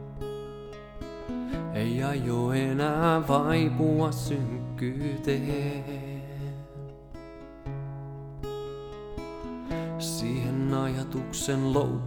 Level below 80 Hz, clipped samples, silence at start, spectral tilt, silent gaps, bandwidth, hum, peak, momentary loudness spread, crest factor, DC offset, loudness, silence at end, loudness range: -48 dBFS; under 0.1%; 0 s; -6.5 dB/octave; none; 18.5 kHz; none; -10 dBFS; 17 LU; 20 dB; under 0.1%; -30 LUFS; 0 s; 12 LU